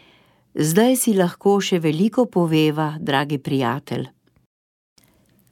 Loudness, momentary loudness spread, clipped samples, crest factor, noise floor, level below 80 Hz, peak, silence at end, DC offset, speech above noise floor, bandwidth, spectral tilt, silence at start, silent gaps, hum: -20 LUFS; 11 LU; under 0.1%; 18 dB; -58 dBFS; -66 dBFS; -2 dBFS; 1.45 s; under 0.1%; 39 dB; 17.5 kHz; -5.5 dB/octave; 0.55 s; none; none